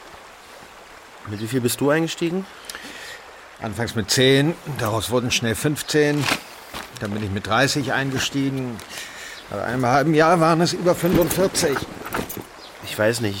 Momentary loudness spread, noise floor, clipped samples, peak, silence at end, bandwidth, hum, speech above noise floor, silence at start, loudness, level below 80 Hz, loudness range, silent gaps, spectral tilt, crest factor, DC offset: 19 LU; -43 dBFS; under 0.1%; -6 dBFS; 0 s; 17 kHz; none; 23 dB; 0 s; -21 LUFS; -48 dBFS; 6 LU; none; -4.5 dB/octave; 16 dB; under 0.1%